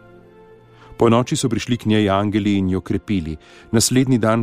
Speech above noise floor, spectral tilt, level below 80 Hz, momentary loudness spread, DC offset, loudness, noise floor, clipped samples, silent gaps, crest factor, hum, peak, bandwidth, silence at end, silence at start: 28 dB; -5.5 dB/octave; -44 dBFS; 8 LU; under 0.1%; -18 LUFS; -46 dBFS; under 0.1%; none; 16 dB; none; -4 dBFS; 15.5 kHz; 0 s; 0.9 s